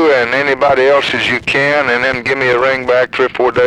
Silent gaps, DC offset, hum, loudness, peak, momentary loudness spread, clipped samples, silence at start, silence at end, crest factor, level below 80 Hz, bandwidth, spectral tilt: none; under 0.1%; none; -12 LUFS; 0 dBFS; 3 LU; under 0.1%; 0 s; 0 s; 12 dB; -46 dBFS; 11 kHz; -4.5 dB/octave